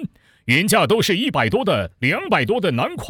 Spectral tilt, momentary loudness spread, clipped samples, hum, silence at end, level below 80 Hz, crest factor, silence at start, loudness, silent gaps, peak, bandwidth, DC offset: -4.5 dB/octave; 5 LU; under 0.1%; none; 0 s; -48 dBFS; 16 dB; 0 s; -18 LUFS; none; -4 dBFS; over 20 kHz; under 0.1%